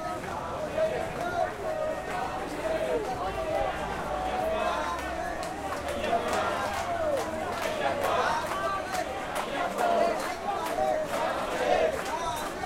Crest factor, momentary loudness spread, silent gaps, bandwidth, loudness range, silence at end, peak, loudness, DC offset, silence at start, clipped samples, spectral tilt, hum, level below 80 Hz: 16 dB; 6 LU; none; 16.5 kHz; 3 LU; 0 s; -14 dBFS; -30 LUFS; under 0.1%; 0 s; under 0.1%; -4 dB/octave; none; -48 dBFS